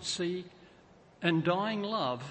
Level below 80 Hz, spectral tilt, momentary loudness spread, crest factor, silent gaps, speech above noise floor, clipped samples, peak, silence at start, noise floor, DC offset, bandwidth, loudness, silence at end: -70 dBFS; -5 dB/octave; 9 LU; 22 dB; none; 27 dB; under 0.1%; -12 dBFS; 0 s; -59 dBFS; under 0.1%; 8.8 kHz; -32 LUFS; 0 s